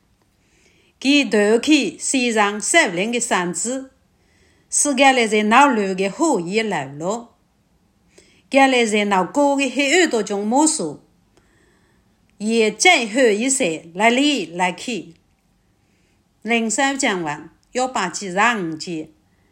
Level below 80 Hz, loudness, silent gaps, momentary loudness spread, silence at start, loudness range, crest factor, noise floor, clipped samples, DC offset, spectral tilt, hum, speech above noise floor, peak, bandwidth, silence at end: -66 dBFS; -18 LUFS; none; 13 LU; 1 s; 4 LU; 20 dB; -61 dBFS; under 0.1%; under 0.1%; -2.5 dB/octave; none; 43 dB; 0 dBFS; 16 kHz; 0.45 s